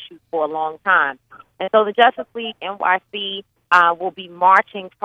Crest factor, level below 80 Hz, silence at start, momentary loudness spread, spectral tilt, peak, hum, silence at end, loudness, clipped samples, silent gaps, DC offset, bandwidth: 18 dB; -70 dBFS; 0 s; 14 LU; -4 dB/octave; 0 dBFS; none; 0.15 s; -18 LUFS; under 0.1%; none; under 0.1%; 8.6 kHz